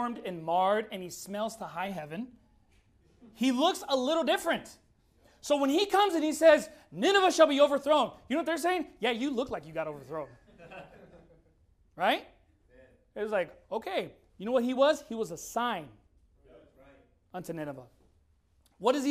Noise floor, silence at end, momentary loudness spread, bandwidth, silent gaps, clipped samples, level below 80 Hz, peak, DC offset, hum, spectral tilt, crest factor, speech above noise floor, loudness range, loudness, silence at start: -68 dBFS; 0 s; 18 LU; 15 kHz; none; under 0.1%; -66 dBFS; -8 dBFS; under 0.1%; none; -3.5 dB/octave; 22 dB; 39 dB; 12 LU; -29 LUFS; 0 s